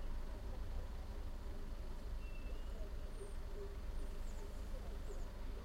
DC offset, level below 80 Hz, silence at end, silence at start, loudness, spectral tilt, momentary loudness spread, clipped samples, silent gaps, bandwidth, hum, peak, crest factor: under 0.1%; -44 dBFS; 0 s; 0 s; -51 LUFS; -6 dB/octave; 2 LU; under 0.1%; none; 15 kHz; 50 Hz at -55 dBFS; -34 dBFS; 12 dB